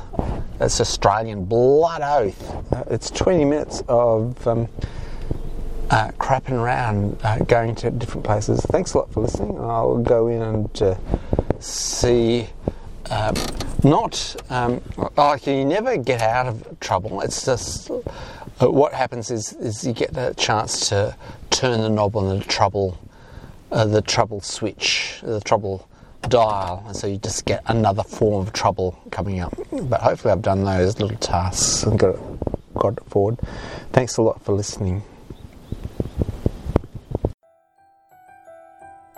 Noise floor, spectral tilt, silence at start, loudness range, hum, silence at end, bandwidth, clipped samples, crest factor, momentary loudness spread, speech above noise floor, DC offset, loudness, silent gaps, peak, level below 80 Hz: -58 dBFS; -5 dB/octave; 0 s; 3 LU; none; 0.2 s; 13.5 kHz; under 0.1%; 20 dB; 12 LU; 37 dB; under 0.1%; -21 LUFS; 37.34-37.38 s; 0 dBFS; -34 dBFS